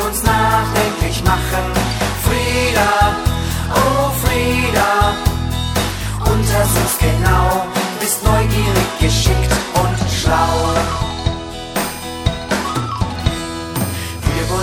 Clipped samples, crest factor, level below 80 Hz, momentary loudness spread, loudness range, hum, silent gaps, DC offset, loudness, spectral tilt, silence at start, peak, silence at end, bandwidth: under 0.1%; 16 dB; -24 dBFS; 7 LU; 4 LU; none; none; under 0.1%; -16 LUFS; -4.5 dB/octave; 0 s; 0 dBFS; 0 s; 17.5 kHz